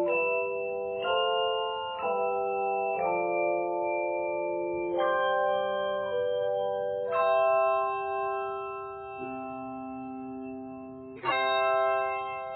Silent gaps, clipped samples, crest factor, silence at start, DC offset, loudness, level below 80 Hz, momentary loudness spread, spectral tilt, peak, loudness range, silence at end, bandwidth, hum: none; under 0.1%; 14 dB; 0 s; under 0.1%; -29 LUFS; -68 dBFS; 13 LU; -1.5 dB/octave; -16 dBFS; 6 LU; 0 s; 4.5 kHz; none